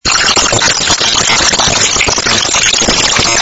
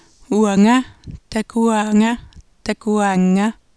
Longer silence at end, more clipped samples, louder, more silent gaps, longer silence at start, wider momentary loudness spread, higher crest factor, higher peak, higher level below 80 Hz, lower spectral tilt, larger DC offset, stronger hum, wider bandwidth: second, 0 s vs 0.25 s; first, 0.5% vs under 0.1%; first, -8 LUFS vs -17 LUFS; neither; second, 0.05 s vs 0.3 s; second, 1 LU vs 12 LU; about the same, 10 dB vs 14 dB; first, 0 dBFS vs -4 dBFS; first, -30 dBFS vs -46 dBFS; second, -0.5 dB/octave vs -6 dB/octave; second, under 0.1% vs 0.1%; neither; about the same, 11 kHz vs 11 kHz